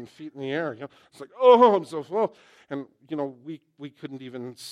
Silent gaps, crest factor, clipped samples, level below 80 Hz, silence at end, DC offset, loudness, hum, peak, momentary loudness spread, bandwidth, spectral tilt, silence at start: none; 22 dB; under 0.1%; -82 dBFS; 0 s; under 0.1%; -22 LUFS; none; -4 dBFS; 24 LU; 12 kHz; -6 dB/octave; 0 s